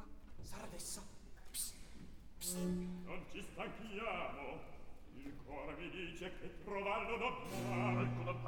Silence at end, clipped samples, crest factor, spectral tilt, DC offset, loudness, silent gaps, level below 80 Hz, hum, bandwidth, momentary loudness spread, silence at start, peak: 0 s; under 0.1%; 18 dB; -4.5 dB/octave; 0.1%; -44 LUFS; none; -58 dBFS; none; 19 kHz; 19 LU; 0 s; -26 dBFS